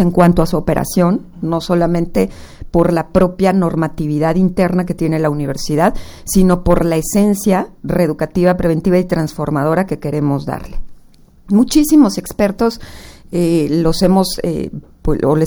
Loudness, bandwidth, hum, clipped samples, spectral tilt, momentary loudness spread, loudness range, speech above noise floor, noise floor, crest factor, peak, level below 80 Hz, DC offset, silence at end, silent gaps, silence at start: -15 LUFS; over 20 kHz; none; under 0.1%; -6.5 dB/octave; 9 LU; 2 LU; 29 dB; -43 dBFS; 14 dB; 0 dBFS; -30 dBFS; under 0.1%; 0 s; none; 0 s